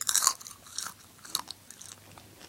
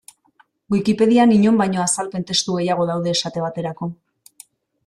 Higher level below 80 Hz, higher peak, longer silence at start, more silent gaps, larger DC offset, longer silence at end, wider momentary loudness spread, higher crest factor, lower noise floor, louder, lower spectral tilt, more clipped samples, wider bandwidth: second, -70 dBFS vs -58 dBFS; first, 0 dBFS vs -4 dBFS; second, 0 s vs 0.7 s; neither; neither; second, 0 s vs 0.95 s; first, 24 LU vs 12 LU; first, 34 dB vs 16 dB; second, -52 dBFS vs -58 dBFS; second, -31 LUFS vs -18 LUFS; second, 1.5 dB/octave vs -4.5 dB/octave; neither; first, 17 kHz vs 13.5 kHz